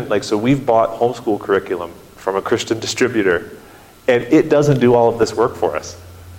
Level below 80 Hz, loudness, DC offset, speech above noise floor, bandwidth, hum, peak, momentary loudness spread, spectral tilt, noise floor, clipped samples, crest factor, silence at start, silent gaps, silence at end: -48 dBFS; -17 LUFS; under 0.1%; 26 dB; 16.5 kHz; none; -2 dBFS; 13 LU; -5.5 dB/octave; -42 dBFS; under 0.1%; 14 dB; 0 s; none; 0 s